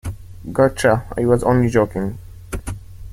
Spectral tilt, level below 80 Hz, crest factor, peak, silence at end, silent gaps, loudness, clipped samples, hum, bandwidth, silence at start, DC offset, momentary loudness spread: -7 dB/octave; -36 dBFS; 18 dB; -2 dBFS; 0 s; none; -18 LUFS; under 0.1%; none; 16 kHz; 0.05 s; under 0.1%; 18 LU